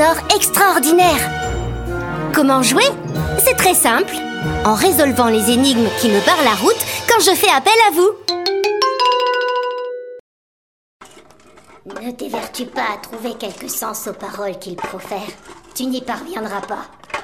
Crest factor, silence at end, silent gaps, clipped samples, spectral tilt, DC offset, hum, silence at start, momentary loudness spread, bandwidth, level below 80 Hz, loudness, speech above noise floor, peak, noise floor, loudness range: 16 dB; 0 s; 10.20-11.00 s; under 0.1%; -3 dB/octave; under 0.1%; none; 0 s; 16 LU; 17 kHz; -38 dBFS; -15 LUFS; 30 dB; 0 dBFS; -46 dBFS; 13 LU